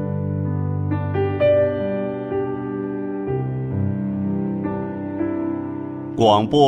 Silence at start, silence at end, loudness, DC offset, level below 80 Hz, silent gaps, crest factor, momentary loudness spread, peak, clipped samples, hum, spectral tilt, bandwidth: 0 s; 0 s; -22 LUFS; under 0.1%; -52 dBFS; none; 18 dB; 9 LU; -2 dBFS; under 0.1%; none; -8 dB/octave; 8.8 kHz